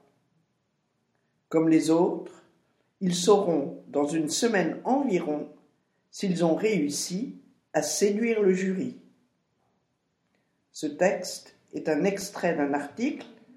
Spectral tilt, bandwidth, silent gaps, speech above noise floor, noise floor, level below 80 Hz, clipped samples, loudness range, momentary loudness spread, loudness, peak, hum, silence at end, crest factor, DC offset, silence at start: -5 dB/octave; 16 kHz; none; 49 dB; -75 dBFS; -76 dBFS; under 0.1%; 5 LU; 14 LU; -26 LUFS; -6 dBFS; none; 0.25 s; 22 dB; under 0.1%; 1.5 s